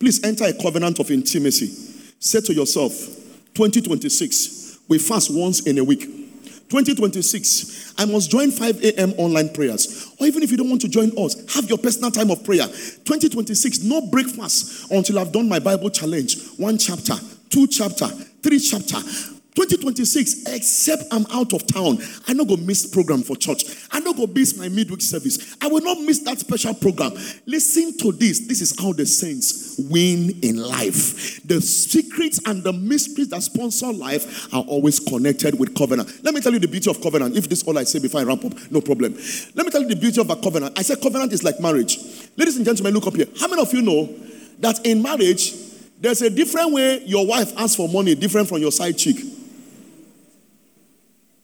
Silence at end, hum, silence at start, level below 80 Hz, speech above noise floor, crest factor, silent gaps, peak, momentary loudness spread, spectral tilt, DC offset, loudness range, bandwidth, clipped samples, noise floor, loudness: 1.8 s; none; 0 s; -66 dBFS; 39 dB; 16 dB; none; -4 dBFS; 7 LU; -3.5 dB/octave; under 0.1%; 2 LU; over 20 kHz; under 0.1%; -58 dBFS; -19 LUFS